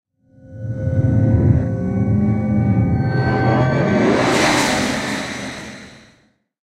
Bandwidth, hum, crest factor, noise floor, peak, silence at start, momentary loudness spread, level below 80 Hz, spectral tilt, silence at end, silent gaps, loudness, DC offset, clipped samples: 14.5 kHz; none; 16 dB; -58 dBFS; -2 dBFS; 0.45 s; 13 LU; -36 dBFS; -6 dB/octave; 0.7 s; none; -17 LUFS; under 0.1%; under 0.1%